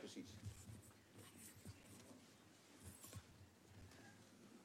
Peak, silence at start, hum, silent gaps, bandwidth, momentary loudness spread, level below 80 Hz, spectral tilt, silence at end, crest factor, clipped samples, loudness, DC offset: -42 dBFS; 0 s; none; none; 16.5 kHz; 9 LU; -80 dBFS; -4.5 dB/octave; 0 s; 18 dB; under 0.1%; -61 LUFS; under 0.1%